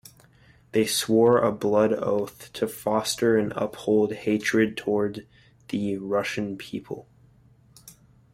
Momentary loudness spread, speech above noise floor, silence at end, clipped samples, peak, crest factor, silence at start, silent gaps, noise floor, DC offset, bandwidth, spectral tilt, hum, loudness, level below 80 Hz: 14 LU; 33 dB; 0.45 s; under 0.1%; -8 dBFS; 18 dB; 0.75 s; none; -57 dBFS; under 0.1%; 16 kHz; -4.5 dB/octave; none; -25 LUFS; -62 dBFS